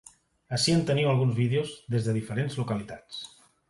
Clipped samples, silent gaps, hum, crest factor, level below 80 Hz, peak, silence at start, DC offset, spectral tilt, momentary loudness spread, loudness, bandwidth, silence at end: under 0.1%; none; none; 14 dB; -60 dBFS; -14 dBFS; 0.5 s; under 0.1%; -5.5 dB/octave; 15 LU; -27 LUFS; 11.5 kHz; 0.45 s